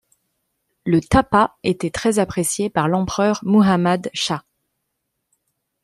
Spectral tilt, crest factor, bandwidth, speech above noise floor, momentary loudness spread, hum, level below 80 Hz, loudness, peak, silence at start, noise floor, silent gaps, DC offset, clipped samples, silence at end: -5 dB/octave; 18 dB; 14.5 kHz; 58 dB; 7 LU; none; -42 dBFS; -19 LUFS; -2 dBFS; 0.85 s; -76 dBFS; none; under 0.1%; under 0.1%; 1.45 s